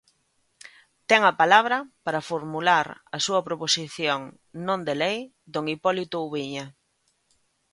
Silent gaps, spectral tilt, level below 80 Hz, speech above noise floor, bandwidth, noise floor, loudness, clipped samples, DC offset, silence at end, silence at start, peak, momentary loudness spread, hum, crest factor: none; -3 dB/octave; -70 dBFS; 46 dB; 11.5 kHz; -71 dBFS; -24 LUFS; under 0.1%; under 0.1%; 1 s; 0.65 s; -2 dBFS; 15 LU; none; 24 dB